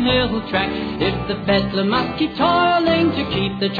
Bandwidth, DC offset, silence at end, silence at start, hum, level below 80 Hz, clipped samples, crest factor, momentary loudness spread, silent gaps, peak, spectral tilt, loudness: 5 kHz; under 0.1%; 0 s; 0 s; none; -40 dBFS; under 0.1%; 16 dB; 6 LU; none; -2 dBFS; -8 dB/octave; -19 LUFS